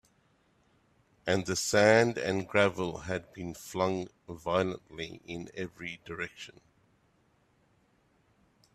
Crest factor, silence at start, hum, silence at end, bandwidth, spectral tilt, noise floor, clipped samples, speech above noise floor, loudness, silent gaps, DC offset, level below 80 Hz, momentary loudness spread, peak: 24 dB; 1.25 s; none; 2.25 s; 14 kHz; -4.5 dB/octave; -69 dBFS; under 0.1%; 38 dB; -31 LUFS; none; under 0.1%; -64 dBFS; 17 LU; -10 dBFS